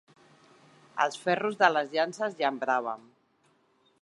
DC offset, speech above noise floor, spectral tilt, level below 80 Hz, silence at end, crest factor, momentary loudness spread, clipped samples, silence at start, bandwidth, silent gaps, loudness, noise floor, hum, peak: under 0.1%; 40 dB; -4 dB/octave; -86 dBFS; 1 s; 24 dB; 11 LU; under 0.1%; 0.95 s; 11.5 kHz; none; -28 LUFS; -68 dBFS; none; -6 dBFS